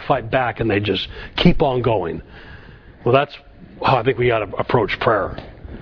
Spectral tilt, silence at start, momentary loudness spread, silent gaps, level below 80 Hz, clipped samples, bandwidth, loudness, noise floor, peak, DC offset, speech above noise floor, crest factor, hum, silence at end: -8 dB/octave; 0 s; 16 LU; none; -36 dBFS; under 0.1%; 5.4 kHz; -19 LUFS; -41 dBFS; 0 dBFS; under 0.1%; 23 dB; 20 dB; none; 0 s